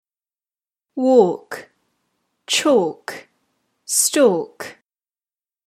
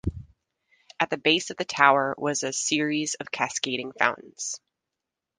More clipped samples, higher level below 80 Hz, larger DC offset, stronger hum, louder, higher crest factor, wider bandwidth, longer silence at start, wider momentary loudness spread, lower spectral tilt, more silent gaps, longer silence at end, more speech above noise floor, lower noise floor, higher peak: neither; second, -70 dBFS vs -50 dBFS; neither; neither; first, -17 LUFS vs -25 LUFS; second, 20 dB vs 26 dB; first, 16 kHz vs 10.5 kHz; first, 0.95 s vs 0.05 s; first, 20 LU vs 14 LU; about the same, -2.5 dB/octave vs -2.5 dB/octave; neither; first, 0.95 s vs 0.8 s; first, over 73 dB vs 60 dB; first, under -90 dBFS vs -86 dBFS; about the same, -2 dBFS vs 0 dBFS